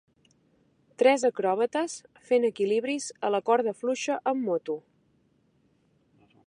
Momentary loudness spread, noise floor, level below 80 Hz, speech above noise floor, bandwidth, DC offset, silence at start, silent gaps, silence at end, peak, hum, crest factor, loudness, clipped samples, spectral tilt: 9 LU; -67 dBFS; -80 dBFS; 41 dB; 11 kHz; under 0.1%; 1 s; none; 1.65 s; -8 dBFS; none; 20 dB; -27 LUFS; under 0.1%; -4 dB/octave